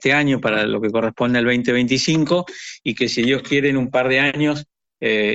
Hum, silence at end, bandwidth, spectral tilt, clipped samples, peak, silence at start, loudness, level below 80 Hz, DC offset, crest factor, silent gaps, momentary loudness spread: none; 0 s; 8.2 kHz; -5 dB/octave; under 0.1%; -4 dBFS; 0 s; -18 LUFS; -52 dBFS; under 0.1%; 14 dB; none; 6 LU